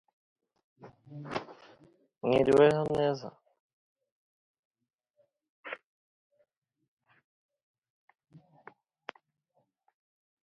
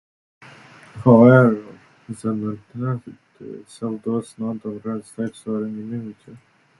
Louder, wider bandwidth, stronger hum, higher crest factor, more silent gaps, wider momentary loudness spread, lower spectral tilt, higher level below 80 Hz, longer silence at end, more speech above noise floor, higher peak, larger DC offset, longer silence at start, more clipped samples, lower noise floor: second, -28 LUFS vs -20 LUFS; about the same, 11 kHz vs 11.5 kHz; neither; about the same, 24 dB vs 20 dB; first, 3.60-3.96 s, 4.12-4.71 s, 4.94-4.98 s, 5.10-5.14 s, 5.49-5.63 s vs none; about the same, 26 LU vs 25 LU; second, -7 dB/octave vs -9 dB/octave; second, -68 dBFS vs -60 dBFS; first, 4.65 s vs 0.45 s; first, 50 dB vs 26 dB; second, -10 dBFS vs 0 dBFS; neither; about the same, 0.85 s vs 0.95 s; neither; first, -77 dBFS vs -45 dBFS